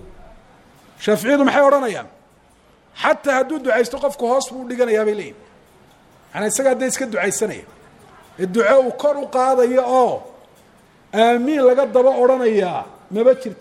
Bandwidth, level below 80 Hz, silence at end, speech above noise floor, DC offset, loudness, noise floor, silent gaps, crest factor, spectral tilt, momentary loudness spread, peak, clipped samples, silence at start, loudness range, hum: 16 kHz; -56 dBFS; 0.05 s; 36 dB; under 0.1%; -17 LUFS; -53 dBFS; none; 18 dB; -4 dB/octave; 12 LU; 0 dBFS; under 0.1%; 0.05 s; 5 LU; none